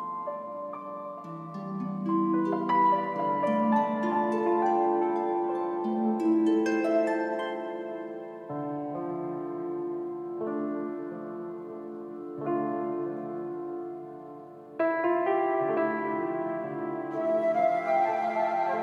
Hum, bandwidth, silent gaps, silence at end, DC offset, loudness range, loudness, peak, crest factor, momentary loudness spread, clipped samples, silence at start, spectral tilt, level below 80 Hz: none; 7.4 kHz; none; 0 s; under 0.1%; 8 LU; -29 LUFS; -14 dBFS; 16 dB; 14 LU; under 0.1%; 0 s; -7.5 dB/octave; -82 dBFS